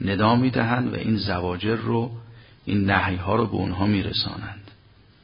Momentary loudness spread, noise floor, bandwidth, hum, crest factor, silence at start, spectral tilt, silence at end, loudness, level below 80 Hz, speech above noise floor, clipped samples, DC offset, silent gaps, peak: 14 LU; -53 dBFS; 5.4 kHz; none; 20 dB; 0 s; -11 dB/octave; 0.55 s; -23 LUFS; -42 dBFS; 31 dB; under 0.1%; under 0.1%; none; -4 dBFS